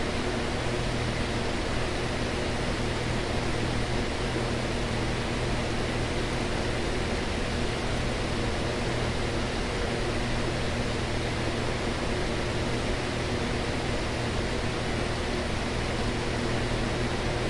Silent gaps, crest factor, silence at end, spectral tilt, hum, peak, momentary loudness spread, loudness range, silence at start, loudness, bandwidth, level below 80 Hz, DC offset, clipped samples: none; 14 dB; 0 s; -5 dB/octave; none; -14 dBFS; 1 LU; 0 LU; 0 s; -29 LUFS; 11.5 kHz; -36 dBFS; under 0.1%; under 0.1%